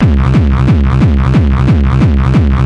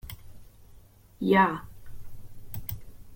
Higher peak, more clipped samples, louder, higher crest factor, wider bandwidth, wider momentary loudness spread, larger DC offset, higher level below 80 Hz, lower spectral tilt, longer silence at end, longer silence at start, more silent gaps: first, 0 dBFS vs -10 dBFS; neither; first, -10 LUFS vs -27 LUFS; second, 8 dB vs 22 dB; second, 6.8 kHz vs 17 kHz; second, 1 LU vs 24 LU; neither; first, -14 dBFS vs -50 dBFS; first, -9 dB/octave vs -6.5 dB/octave; about the same, 0 s vs 0 s; about the same, 0 s vs 0.05 s; neither